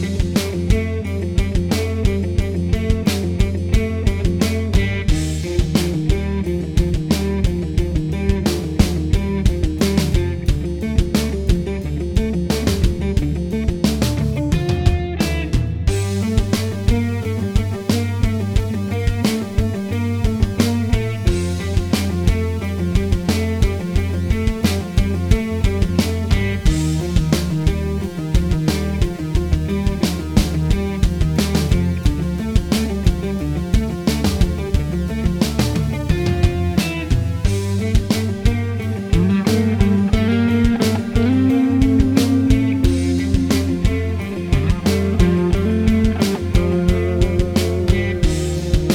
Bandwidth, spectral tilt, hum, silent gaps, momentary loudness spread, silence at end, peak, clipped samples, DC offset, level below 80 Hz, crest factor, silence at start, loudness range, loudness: 17 kHz; -6.5 dB/octave; none; none; 5 LU; 0 s; 0 dBFS; under 0.1%; under 0.1%; -24 dBFS; 18 dB; 0 s; 3 LU; -19 LUFS